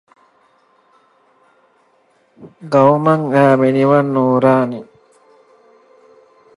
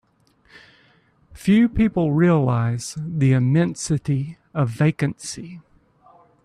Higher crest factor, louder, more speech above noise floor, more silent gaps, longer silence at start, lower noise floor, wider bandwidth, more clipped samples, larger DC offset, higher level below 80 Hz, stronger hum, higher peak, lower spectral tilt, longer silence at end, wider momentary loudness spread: about the same, 18 dB vs 14 dB; first, -13 LUFS vs -20 LUFS; first, 44 dB vs 40 dB; neither; first, 2.4 s vs 1.35 s; about the same, -57 dBFS vs -59 dBFS; second, 11 kHz vs 12.5 kHz; neither; neither; second, -66 dBFS vs -46 dBFS; neither; first, 0 dBFS vs -6 dBFS; first, -8.5 dB/octave vs -7 dB/octave; first, 1.75 s vs 0.85 s; second, 6 LU vs 12 LU